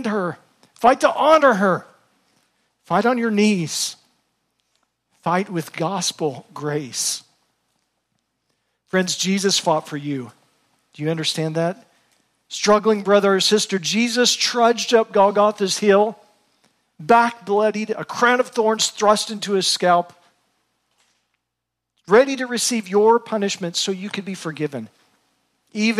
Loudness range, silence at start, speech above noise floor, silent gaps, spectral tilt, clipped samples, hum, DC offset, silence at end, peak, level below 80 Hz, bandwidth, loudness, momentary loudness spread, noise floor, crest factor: 8 LU; 0 s; 62 dB; none; -3.5 dB/octave; under 0.1%; none; under 0.1%; 0 s; -4 dBFS; -66 dBFS; 15 kHz; -19 LUFS; 12 LU; -81 dBFS; 18 dB